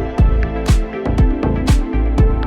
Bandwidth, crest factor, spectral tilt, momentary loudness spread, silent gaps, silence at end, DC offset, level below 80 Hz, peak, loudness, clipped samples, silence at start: 12 kHz; 12 dB; -7 dB/octave; 3 LU; none; 0 s; under 0.1%; -16 dBFS; -2 dBFS; -17 LUFS; under 0.1%; 0 s